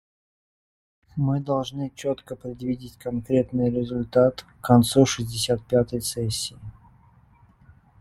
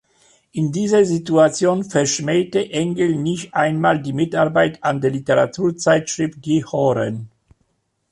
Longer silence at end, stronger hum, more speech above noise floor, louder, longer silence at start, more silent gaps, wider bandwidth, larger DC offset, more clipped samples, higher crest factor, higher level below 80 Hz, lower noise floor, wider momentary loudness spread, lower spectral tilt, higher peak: first, 1.3 s vs 0.85 s; neither; second, 32 dB vs 49 dB; second, -24 LUFS vs -18 LUFS; first, 1.15 s vs 0.55 s; neither; first, 15.5 kHz vs 11.5 kHz; neither; neither; first, 22 dB vs 16 dB; first, -52 dBFS vs -58 dBFS; second, -56 dBFS vs -67 dBFS; first, 13 LU vs 7 LU; about the same, -5.5 dB/octave vs -5.5 dB/octave; about the same, -2 dBFS vs -2 dBFS